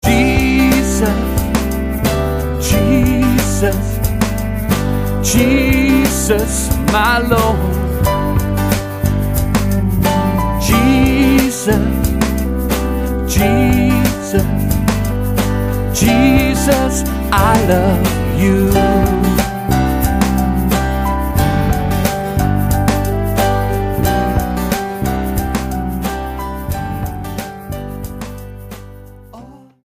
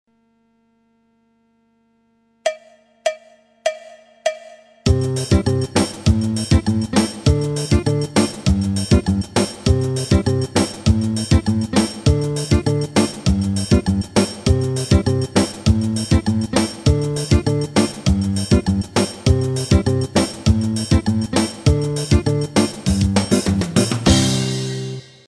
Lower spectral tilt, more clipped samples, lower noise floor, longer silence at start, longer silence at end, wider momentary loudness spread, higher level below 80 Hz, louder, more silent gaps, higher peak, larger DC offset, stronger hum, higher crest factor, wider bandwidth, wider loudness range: about the same, -5.5 dB/octave vs -5.5 dB/octave; neither; second, -37 dBFS vs -61 dBFS; second, 0.05 s vs 2.45 s; about the same, 0.3 s vs 0.25 s; about the same, 9 LU vs 8 LU; first, -22 dBFS vs -28 dBFS; first, -15 LUFS vs -18 LUFS; neither; about the same, 0 dBFS vs -2 dBFS; neither; second, none vs 50 Hz at -40 dBFS; about the same, 14 dB vs 16 dB; first, 15.5 kHz vs 13.5 kHz; about the same, 6 LU vs 6 LU